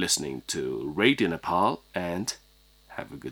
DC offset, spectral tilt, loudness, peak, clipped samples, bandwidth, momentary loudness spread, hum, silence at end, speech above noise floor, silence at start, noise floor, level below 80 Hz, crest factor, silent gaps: under 0.1%; -3 dB/octave; -27 LUFS; -6 dBFS; under 0.1%; over 20 kHz; 17 LU; none; 0 s; 27 dB; 0 s; -54 dBFS; -58 dBFS; 22 dB; none